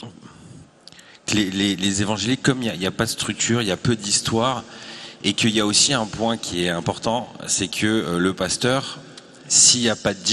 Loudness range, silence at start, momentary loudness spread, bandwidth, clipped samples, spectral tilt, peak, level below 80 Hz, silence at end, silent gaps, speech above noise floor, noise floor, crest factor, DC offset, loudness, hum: 4 LU; 0 s; 10 LU; 13 kHz; under 0.1%; -3 dB/octave; 0 dBFS; -52 dBFS; 0 s; none; 26 dB; -47 dBFS; 22 dB; under 0.1%; -20 LUFS; none